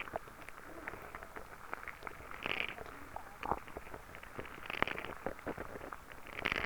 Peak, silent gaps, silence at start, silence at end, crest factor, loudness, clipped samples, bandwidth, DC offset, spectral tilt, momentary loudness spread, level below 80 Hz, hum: -10 dBFS; none; 0 s; 0 s; 34 dB; -43 LUFS; under 0.1%; over 20 kHz; under 0.1%; -4 dB/octave; 12 LU; -58 dBFS; none